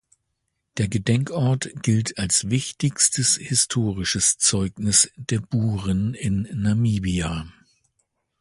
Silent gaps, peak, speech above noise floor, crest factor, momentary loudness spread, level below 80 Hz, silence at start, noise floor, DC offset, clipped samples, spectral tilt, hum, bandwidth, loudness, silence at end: none; -2 dBFS; 54 dB; 20 dB; 8 LU; -44 dBFS; 0.75 s; -77 dBFS; under 0.1%; under 0.1%; -3.5 dB/octave; none; 11.5 kHz; -21 LUFS; 0.9 s